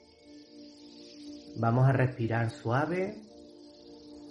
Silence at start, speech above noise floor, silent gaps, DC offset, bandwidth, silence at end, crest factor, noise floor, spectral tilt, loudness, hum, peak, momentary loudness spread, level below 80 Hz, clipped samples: 0.3 s; 26 dB; none; under 0.1%; 10 kHz; 0 s; 18 dB; -54 dBFS; -8 dB/octave; -29 LUFS; none; -14 dBFS; 26 LU; -66 dBFS; under 0.1%